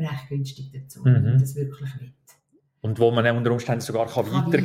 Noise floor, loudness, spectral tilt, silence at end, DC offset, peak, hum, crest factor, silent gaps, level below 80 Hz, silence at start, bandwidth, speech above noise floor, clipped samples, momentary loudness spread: -64 dBFS; -23 LUFS; -7 dB/octave; 0 s; under 0.1%; -6 dBFS; none; 16 dB; none; -60 dBFS; 0 s; 15 kHz; 42 dB; under 0.1%; 16 LU